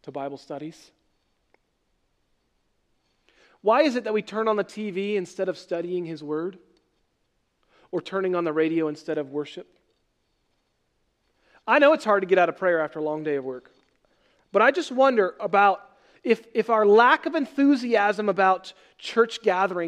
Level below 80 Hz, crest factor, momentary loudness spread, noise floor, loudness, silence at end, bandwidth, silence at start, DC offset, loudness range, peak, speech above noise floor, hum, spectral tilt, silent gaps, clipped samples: -76 dBFS; 20 dB; 16 LU; -72 dBFS; -23 LUFS; 0 s; 11 kHz; 0.05 s; under 0.1%; 10 LU; -4 dBFS; 49 dB; none; -5.5 dB/octave; none; under 0.1%